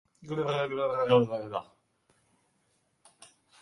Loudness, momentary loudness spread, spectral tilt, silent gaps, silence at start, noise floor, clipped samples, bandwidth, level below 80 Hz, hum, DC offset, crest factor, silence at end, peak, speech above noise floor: -29 LUFS; 13 LU; -6.5 dB/octave; none; 0.2 s; -73 dBFS; under 0.1%; 11 kHz; -70 dBFS; none; under 0.1%; 22 dB; 0.35 s; -10 dBFS; 45 dB